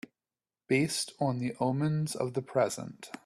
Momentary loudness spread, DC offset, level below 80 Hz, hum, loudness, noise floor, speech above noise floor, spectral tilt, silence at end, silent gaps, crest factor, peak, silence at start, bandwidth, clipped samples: 5 LU; under 0.1%; -70 dBFS; none; -31 LUFS; under -90 dBFS; over 59 dB; -5 dB/octave; 0.1 s; none; 16 dB; -16 dBFS; 0.7 s; 13.5 kHz; under 0.1%